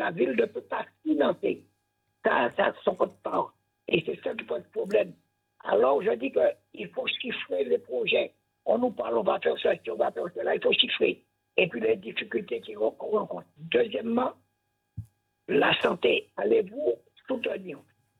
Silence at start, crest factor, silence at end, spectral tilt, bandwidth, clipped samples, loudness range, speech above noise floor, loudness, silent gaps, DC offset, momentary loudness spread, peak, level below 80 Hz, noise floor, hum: 0 s; 22 dB; 0.4 s; -6.5 dB/octave; 5.6 kHz; under 0.1%; 3 LU; 50 dB; -28 LUFS; none; under 0.1%; 13 LU; -8 dBFS; -70 dBFS; -77 dBFS; none